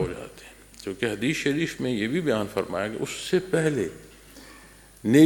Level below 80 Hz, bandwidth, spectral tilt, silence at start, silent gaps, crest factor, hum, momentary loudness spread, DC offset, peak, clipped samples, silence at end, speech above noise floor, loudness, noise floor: -54 dBFS; 17.5 kHz; -5.5 dB/octave; 0 s; none; 20 dB; none; 22 LU; under 0.1%; -4 dBFS; under 0.1%; 0 s; 24 dB; -27 LUFS; -50 dBFS